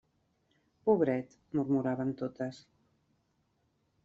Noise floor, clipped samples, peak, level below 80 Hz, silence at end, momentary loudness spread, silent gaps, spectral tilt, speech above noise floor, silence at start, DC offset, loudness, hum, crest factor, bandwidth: -76 dBFS; under 0.1%; -14 dBFS; -72 dBFS; 1.45 s; 10 LU; none; -8 dB/octave; 44 dB; 0.85 s; under 0.1%; -33 LUFS; none; 22 dB; 7.6 kHz